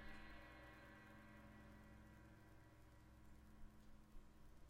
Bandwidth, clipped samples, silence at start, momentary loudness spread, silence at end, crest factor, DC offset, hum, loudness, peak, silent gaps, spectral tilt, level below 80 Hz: 15.5 kHz; under 0.1%; 0 s; 7 LU; 0 s; 16 dB; under 0.1%; none; -65 LUFS; -46 dBFS; none; -5.5 dB/octave; -66 dBFS